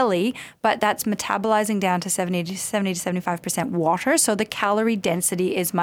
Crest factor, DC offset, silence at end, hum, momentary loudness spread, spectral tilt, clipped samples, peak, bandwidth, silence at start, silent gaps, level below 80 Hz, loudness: 16 dB; under 0.1%; 0 s; none; 6 LU; -4 dB/octave; under 0.1%; -6 dBFS; 18 kHz; 0 s; none; -62 dBFS; -22 LUFS